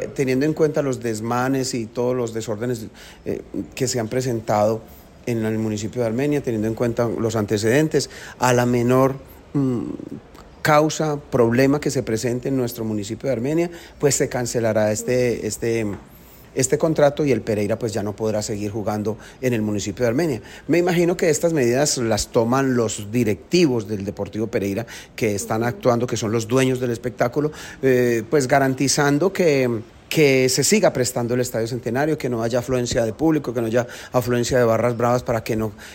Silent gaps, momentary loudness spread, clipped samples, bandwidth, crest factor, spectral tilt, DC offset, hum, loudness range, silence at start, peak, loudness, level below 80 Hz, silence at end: none; 9 LU; under 0.1%; 16.5 kHz; 16 dB; -5 dB/octave; under 0.1%; none; 4 LU; 0 s; -4 dBFS; -21 LUFS; -48 dBFS; 0 s